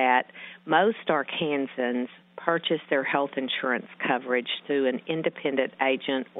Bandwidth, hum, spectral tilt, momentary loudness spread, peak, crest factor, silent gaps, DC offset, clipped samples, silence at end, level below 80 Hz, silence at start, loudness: 4 kHz; none; -8.5 dB/octave; 6 LU; -4 dBFS; 22 dB; none; under 0.1%; under 0.1%; 0 s; -80 dBFS; 0 s; -27 LUFS